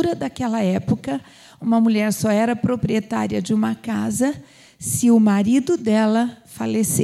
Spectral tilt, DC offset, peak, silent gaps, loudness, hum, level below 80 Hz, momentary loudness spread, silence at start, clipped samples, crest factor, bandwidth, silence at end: -5.5 dB/octave; under 0.1%; -6 dBFS; none; -20 LUFS; none; -54 dBFS; 9 LU; 0 s; under 0.1%; 12 dB; 15 kHz; 0 s